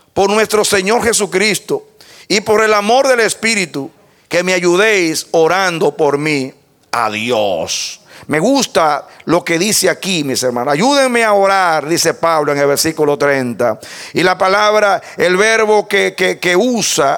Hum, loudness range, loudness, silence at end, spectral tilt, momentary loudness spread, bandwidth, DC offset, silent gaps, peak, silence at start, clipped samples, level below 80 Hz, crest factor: none; 3 LU; -13 LUFS; 0 s; -3 dB/octave; 8 LU; 18.5 kHz; under 0.1%; none; 0 dBFS; 0.15 s; under 0.1%; -52 dBFS; 12 dB